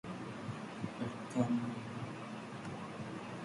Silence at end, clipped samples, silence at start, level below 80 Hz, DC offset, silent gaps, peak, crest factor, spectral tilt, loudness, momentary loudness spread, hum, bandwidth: 0 s; under 0.1%; 0.05 s; -70 dBFS; under 0.1%; none; -20 dBFS; 22 dB; -6.5 dB/octave; -41 LUFS; 10 LU; none; 11.5 kHz